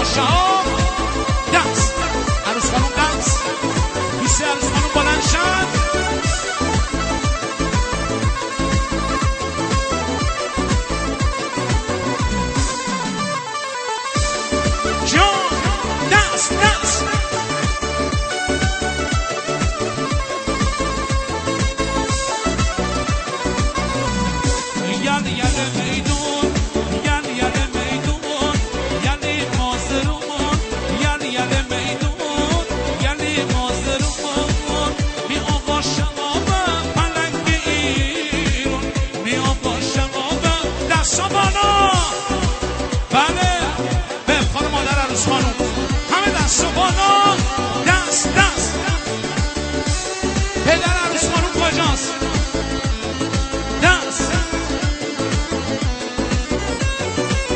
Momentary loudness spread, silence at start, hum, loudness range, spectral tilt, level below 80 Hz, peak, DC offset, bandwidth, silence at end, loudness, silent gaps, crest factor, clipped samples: 6 LU; 0 s; none; 4 LU; -3.5 dB/octave; -26 dBFS; 0 dBFS; under 0.1%; 8.8 kHz; 0 s; -19 LUFS; none; 18 dB; under 0.1%